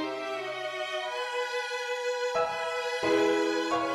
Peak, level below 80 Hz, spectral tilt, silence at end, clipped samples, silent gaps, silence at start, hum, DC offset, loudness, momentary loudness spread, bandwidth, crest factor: -14 dBFS; -70 dBFS; -3 dB/octave; 0 s; under 0.1%; none; 0 s; none; under 0.1%; -30 LUFS; 8 LU; 14.5 kHz; 16 dB